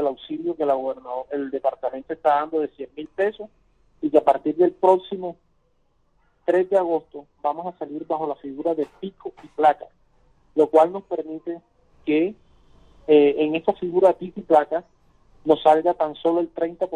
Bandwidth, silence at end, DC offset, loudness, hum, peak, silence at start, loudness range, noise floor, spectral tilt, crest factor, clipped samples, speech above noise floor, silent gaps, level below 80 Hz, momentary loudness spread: 9.4 kHz; 0 s; under 0.1%; -22 LUFS; none; -2 dBFS; 0 s; 5 LU; -64 dBFS; -7 dB/octave; 20 dB; under 0.1%; 43 dB; none; -64 dBFS; 16 LU